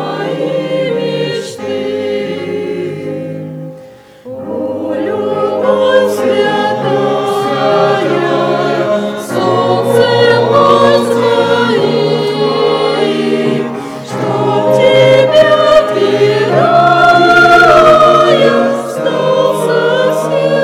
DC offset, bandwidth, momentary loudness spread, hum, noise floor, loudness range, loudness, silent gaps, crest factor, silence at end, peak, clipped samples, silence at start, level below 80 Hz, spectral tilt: under 0.1%; 15.5 kHz; 12 LU; none; -35 dBFS; 11 LU; -10 LUFS; none; 10 dB; 0 s; 0 dBFS; 0.5%; 0 s; -46 dBFS; -5.5 dB/octave